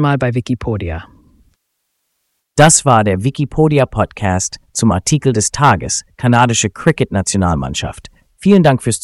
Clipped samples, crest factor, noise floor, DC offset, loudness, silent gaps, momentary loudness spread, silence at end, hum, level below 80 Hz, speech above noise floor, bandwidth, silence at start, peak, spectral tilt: under 0.1%; 14 dB; -70 dBFS; under 0.1%; -14 LUFS; none; 11 LU; 0.05 s; none; -36 dBFS; 56 dB; 12 kHz; 0 s; 0 dBFS; -5 dB/octave